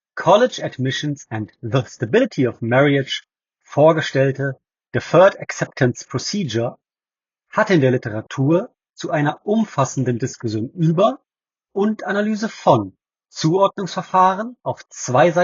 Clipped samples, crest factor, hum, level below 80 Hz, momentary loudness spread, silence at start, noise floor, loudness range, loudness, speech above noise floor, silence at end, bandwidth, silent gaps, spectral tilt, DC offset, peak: under 0.1%; 18 dB; none; -62 dBFS; 12 LU; 0.15 s; under -90 dBFS; 3 LU; -19 LUFS; over 72 dB; 0 s; 7.6 kHz; none; -5 dB/octave; under 0.1%; 0 dBFS